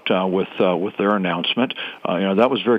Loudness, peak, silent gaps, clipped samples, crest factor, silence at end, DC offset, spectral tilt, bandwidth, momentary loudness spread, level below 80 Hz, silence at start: -20 LUFS; -6 dBFS; none; under 0.1%; 14 dB; 0 s; under 0.1%; -8 dB/octave; 5.6 kHz; 6 LU; -66 dBFS; 0.05 s